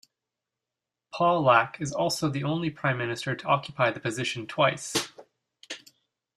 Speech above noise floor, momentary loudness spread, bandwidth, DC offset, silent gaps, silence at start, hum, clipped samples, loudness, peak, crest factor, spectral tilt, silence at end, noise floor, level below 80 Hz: 62 dB; 18 LU; 14.5 kHz; under 0.1%; none; 1.15 s; none; under 0.1%; -26 LUFS; -6 dBFS; 24 dB; -4.5 dB/octave; 0.6 s; -88 dBFS; -66 dBFS